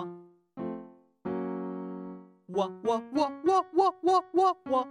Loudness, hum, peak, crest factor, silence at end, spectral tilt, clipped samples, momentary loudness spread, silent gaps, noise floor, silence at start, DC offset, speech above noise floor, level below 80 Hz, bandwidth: -29 LUFS; none; -12 dBFS; 16 dB; 0 s; -6 dB/octave; under 0.1%; 17 LU; none; -49 dBFS; 0 s; under 0.1%; 22 dB; -74 dBFS; 10.5 kHz